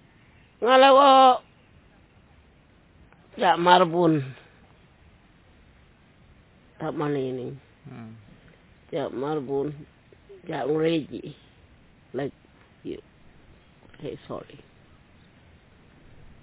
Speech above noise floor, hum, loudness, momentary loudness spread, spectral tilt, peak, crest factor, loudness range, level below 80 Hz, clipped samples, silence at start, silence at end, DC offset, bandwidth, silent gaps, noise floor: 35 dB; none; -22 LUFS; 28 LU; -9.5 dB/octave; -2 dBFS; 24 dB; 19 LU; -60 dBFS; under 0.1%; 0.6 s; 1.85 s; under 0.1%; 4 kHz; none; -57 dBFS